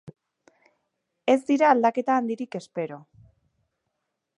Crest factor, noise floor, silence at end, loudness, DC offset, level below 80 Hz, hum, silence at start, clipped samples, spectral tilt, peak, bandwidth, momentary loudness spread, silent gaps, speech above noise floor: 22 dB; -80 dBFS; 1.4 s; -24 LUFS; under 0.1%; -74 dBFS; none; 0.05 s; under 0.1%; -5.5 dB/octave; -6 dBFS; 11 kHz; 14 LU; none; 58 dB